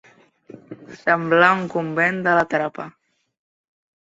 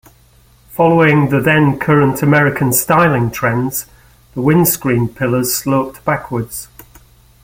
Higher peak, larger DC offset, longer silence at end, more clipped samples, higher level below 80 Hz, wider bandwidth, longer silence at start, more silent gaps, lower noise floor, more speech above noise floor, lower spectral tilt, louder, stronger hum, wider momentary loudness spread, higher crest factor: about the same, 0 dBFS vs 0 dBFS; neither; first, 1.25 s vs 0.8 s; neither; second, -64 dBFS vs -44 dBFS; second, 8 kHz vs 17 kHz; about the same, 0.7 s vs 0.7 s; neither; about the same, -48 dBFS vs -48 dBFS; second, 29 dB vs 35 dB; about the same, -6.5 dB/octave vs -5.5 dB/octave; second, -19 LUFS vs -14 LUFS; neither; first, 24 LU vs 11 LU; first, 22 dB vs 14 dB